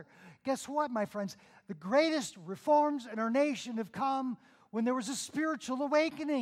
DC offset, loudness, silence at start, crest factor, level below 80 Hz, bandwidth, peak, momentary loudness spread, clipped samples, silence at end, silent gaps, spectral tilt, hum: under 0.1%; -33 LUFS; 0 s; 16 dB; -80 dBFS; 15 kHz; -16 dBFS; 13 LU; under 0.1%; 0 s; none; -4 dB/octave; none